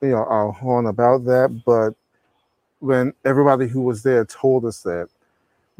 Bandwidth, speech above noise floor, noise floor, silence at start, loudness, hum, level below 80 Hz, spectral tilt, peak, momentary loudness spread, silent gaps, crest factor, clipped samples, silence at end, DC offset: 15 kHz; 50 dB; -68 dBFS; 0 s; -19 LUFS; none; -60 dBFS; -8 dB/octave; 0 dBFS; 10 LU; none; 18 dB; under 0.1%; 0.75 s; under 0.1%